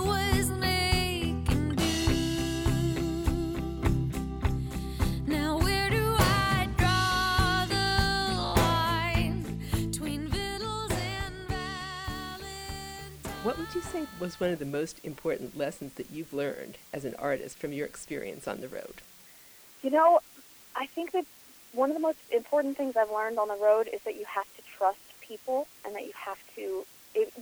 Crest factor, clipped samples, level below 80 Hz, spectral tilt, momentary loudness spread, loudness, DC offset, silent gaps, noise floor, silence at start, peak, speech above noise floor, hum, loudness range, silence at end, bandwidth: 20 dB; under 0.1%; -40 dBFS; -5 dB/octave; 14 LU; -30 LUFS; under 0.1%; none; -54 dBFS; 0 s; -10 dBFS; 23 dB; none; 9 LU; 0 s; over 20 kHz